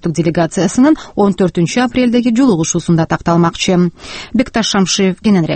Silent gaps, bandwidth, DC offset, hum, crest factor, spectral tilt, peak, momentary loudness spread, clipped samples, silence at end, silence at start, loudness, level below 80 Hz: none; 8.8 kHz; under 0.1%; none; 12 dB; -5 dB/octave; 0 dBFS; 4 LU; under 0.1%; 0 s; 0.05 s; -13 LUFS; -40 dBFS